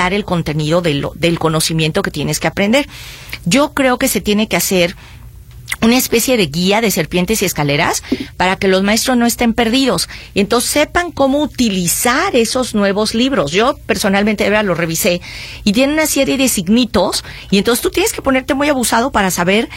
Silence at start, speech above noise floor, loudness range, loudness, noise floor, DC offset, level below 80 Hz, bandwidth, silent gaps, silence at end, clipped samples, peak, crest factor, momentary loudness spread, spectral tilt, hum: 0 s; 20 dB; 1 LU; -14 LUFS; -35 dBFS; under 0.1%; -36 dBFS; 16.5 kHz; none; 0 s; under 0.1%; 0 dBFS; 14 dB; 5 LU; -4 dB/octave; none